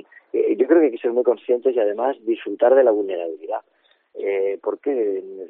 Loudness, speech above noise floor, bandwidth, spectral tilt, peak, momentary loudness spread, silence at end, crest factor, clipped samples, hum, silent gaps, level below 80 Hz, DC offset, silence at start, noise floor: -20 LUFS; 19 dB; 3.9 kHz; -3.5 dB/octave; -4 dBFS; 12 LU; 0 s; 18 dB; under 0.1%; none; none; -80 dBFS; under 0.1%; 0.35 s; -39 dBFS